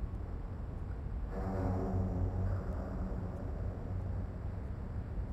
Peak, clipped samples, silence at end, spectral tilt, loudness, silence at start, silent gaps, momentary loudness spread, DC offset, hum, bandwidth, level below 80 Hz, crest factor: -22 dBFS; under 0.1%; 0 s; -10 dB/octave; -40 LUFS; 0 s; none; 7 LU; under 0.1%; none; 7.4 kHz; -42 dBFS; 14 dB